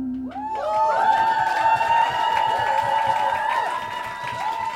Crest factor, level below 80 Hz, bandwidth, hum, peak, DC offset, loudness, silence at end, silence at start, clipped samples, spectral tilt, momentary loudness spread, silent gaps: 14 dB; -56 dBFS; 15.5 kHz; none; -8 dBFS; under 0.1%; -21 LUFS; 0 s; 0 s; under 0.1%; -3.5 dB/octave; 10 LU; none